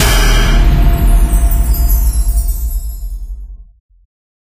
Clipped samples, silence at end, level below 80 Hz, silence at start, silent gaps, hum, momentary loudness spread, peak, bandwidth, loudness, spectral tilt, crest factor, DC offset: under 0.1%; 0.85 s; -12 dBFS; 0 s; none; none; 16 LU; 0 dBFS; 15.5 kHz; -14 LUFS; -4.5 dB/octave; 12 dB; under 0.1%